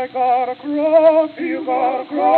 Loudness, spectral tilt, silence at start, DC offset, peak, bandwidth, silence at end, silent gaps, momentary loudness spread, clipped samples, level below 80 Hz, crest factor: -17 LUFS; -8 dB/octave; 0 s; under 0.1%; -2 dBFS; 4.5 kHz; 0 s; none; 9 LU; under 0.1%; -74 dBFS; 14 dB